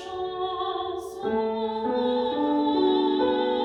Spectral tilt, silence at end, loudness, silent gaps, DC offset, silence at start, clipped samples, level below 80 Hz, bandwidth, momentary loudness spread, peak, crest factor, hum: -5.5 dB/octave; 0 s; -26 LUFS; none; under 0.1%; 0 s; under 0.1%; -60 dBFS; 11 kHz; 8 LU; -12 dBFS; 14 dB; none